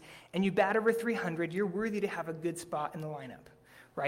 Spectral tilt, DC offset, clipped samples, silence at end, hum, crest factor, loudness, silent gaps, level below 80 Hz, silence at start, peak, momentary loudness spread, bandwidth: -6 dB/octave; under 0.1%; under 0.1%; 0 s; none; 20 dB; -33 LUFS; none; -70 dBFS; 0 s; -14 dBFS; 14 LU; 16 kHz